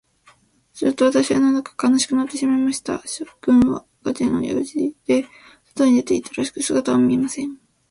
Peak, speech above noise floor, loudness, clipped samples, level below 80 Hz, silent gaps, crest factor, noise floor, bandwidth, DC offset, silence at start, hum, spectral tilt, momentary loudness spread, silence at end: -4 dBFS; 37 dB; -20 LUFS; under 0.1%; -54 dBFS; none; 16 dB; -56 dBFS; 11.5 kHz; under 0.1%; 0.75 s; none; -4.5 dB/octave; 11 LU; 0.35 s